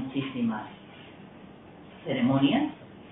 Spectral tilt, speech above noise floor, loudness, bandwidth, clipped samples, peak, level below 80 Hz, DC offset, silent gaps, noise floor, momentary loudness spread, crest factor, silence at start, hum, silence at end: -10.5 dB/octave; 22 dB; -28 LUFS; 3.9 kHz; under 0.1%; -12 dBFS; -66 dBFS; under 0.1%; none; -48 dBFS; 25 LU; 18 dB; 0 s; none; 0 s